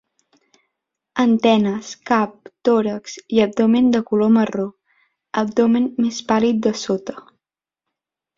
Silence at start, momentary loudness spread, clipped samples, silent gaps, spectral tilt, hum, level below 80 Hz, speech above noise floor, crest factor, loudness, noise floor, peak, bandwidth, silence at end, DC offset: 1.15 s; 11 LU; under 0.1%; none; -5.5 dB/octave; none; -60 dBFS; 68 dB; 18 dB; -19 LUFS; -86 dBFS; -2 dBFS; 7.6 kHz; 1.15 s; under 0.1%